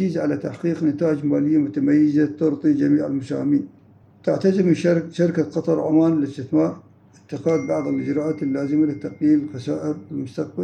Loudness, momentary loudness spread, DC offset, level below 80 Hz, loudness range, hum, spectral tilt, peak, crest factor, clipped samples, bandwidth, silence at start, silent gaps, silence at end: -21 LUFS; 9 LU; under 0.1%; -68 dBFS; 3 LU; none; -8.5 dB/octave; -6 dBFS; 14 dB; under 0.1%; 8.8 kHz; 0 s; none; 0 s